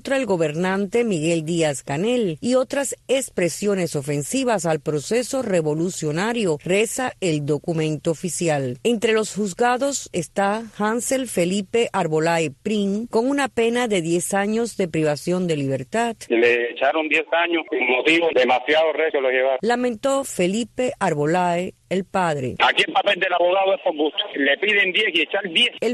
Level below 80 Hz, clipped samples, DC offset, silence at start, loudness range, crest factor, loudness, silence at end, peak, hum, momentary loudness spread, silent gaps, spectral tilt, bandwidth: -58 dBFS; under 0.1%; under 0.1%; 0.05 s; 3 LU; 16 dB; -21 LUFS; 0 s; -6 dBFS; none; 6 LU; none; -4 dB/octave; 12.5 kHz